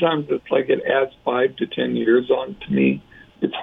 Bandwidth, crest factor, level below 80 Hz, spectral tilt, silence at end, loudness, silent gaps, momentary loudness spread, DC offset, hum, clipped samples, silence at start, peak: 3.9 kHz; 14 dB; -58 dBFS; -9 dB/octave; 0 s; -21 LUFS; none; 6 LU; under 0.1%; none; under 0.1%; 0 s; -6 dBFS